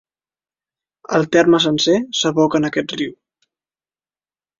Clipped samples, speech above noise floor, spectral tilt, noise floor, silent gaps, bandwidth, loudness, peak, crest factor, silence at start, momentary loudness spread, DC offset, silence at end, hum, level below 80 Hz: under 0.1%; over 74 dB; -4.5 dB/octave; under -90 dBFS; none; 7.6 kHz; -16 LUFS; -2 dBFS; 18 dB; 1.1 s; 10 LU; under 0.1%; 1.5 s; none; -58 dBFS